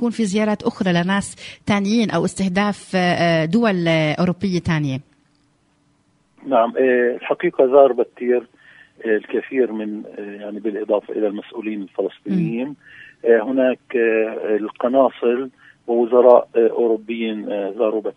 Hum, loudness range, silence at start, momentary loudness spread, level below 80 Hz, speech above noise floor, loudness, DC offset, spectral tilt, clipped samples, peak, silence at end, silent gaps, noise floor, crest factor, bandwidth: none; 6 LU; 0 s; 13 LU; -56 dBFS; 43 dB; -19 LUFS; under 0.1%; -6.5 dB/octave; under 0.1%; 0 dBFS; 0.05 s; none; -61 dBFS; 18 dB; 11 kHz